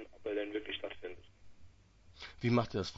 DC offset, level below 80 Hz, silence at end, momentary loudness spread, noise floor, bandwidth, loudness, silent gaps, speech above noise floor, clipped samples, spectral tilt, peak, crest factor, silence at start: under 0.1%; -62 dBFS; 0 s; 19 LU; -61 dBFS; 7.6 kHz; -37 LUFS; none; 26 dB; under 0.1%; -5 dB/octave; -18 dBFS; 22 dB; 0 s